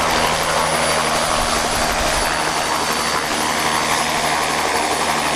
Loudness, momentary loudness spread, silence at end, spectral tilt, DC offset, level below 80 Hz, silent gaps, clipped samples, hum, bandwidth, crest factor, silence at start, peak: -17 LUFS; 2 LU; 0 s; -2 dB/octave; under 0.1%; -36 dBFS; none; under 0.1%; none; 16 kHz; 14 dB; 0 s; -4 dBFS